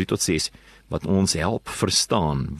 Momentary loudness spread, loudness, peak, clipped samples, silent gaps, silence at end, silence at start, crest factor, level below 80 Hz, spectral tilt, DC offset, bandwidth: 10 LU; -23 LUFS; -6 dBFS; under 0.1%; none; 0 s; 0 s; 18 dB; -42 dBFS; -4 dB/octave; under 0.1%; 13 kHz